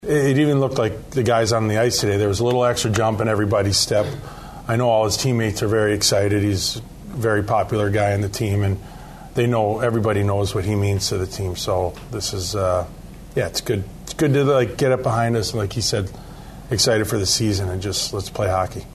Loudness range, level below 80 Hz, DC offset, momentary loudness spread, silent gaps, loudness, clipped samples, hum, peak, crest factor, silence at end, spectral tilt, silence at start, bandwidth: 3 LU; -42 dBFS; under 0.1%; 9 LU; none; -20 LUFS; under 0.1%; none; -4 dBFS; 16 dB; 0 s; -4.5 dB/octave; 0 s; 13.5 kHz